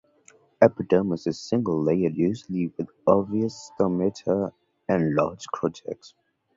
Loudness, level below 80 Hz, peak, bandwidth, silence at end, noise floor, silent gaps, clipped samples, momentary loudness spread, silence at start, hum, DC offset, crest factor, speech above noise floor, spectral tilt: -25 LUFS; -58 dBFS; -2 dBFS; 7.8 kHz; 0.5 s; -58 dBFS; none; under 0.1%; 10 LU; 0.6 s; none; under 0.1%; 22 dB; 34 dB; -7.5 dB/octave